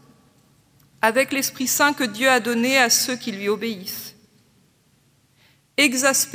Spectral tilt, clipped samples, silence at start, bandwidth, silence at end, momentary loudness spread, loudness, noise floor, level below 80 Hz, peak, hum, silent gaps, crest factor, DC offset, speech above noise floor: -1.5 dB/octave; under 0.1%; 1.05 s; 16.5 kHz; 0 s; 12 LU; -19 LUFS; -60 dBFS; -70 dBFS; -2 dBFS; none; none; 20 dB; under 0.1%; 40 dB